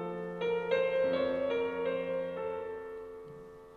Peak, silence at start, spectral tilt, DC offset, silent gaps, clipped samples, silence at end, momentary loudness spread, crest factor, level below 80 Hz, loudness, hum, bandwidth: -18 dBFS; 0 s; -7 dB/octave; under 0.1%; none; under 0.1%; 0 s; 16 LU; 16 dB; -66 dBFS; -33 LUFS; none; 6.6 kHz